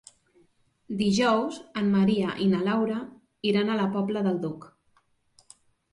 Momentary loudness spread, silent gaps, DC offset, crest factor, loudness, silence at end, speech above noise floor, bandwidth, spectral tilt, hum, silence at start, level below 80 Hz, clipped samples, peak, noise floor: 12 LU; none; under 0.1%; 16 dB; -26 LUFS; 1.25 s; 42 dB; 11 kHz; -6 dB/octave; none; 0.9 s; -64 dBFS; under 0.1%; -10 dBFS; -67 dBFS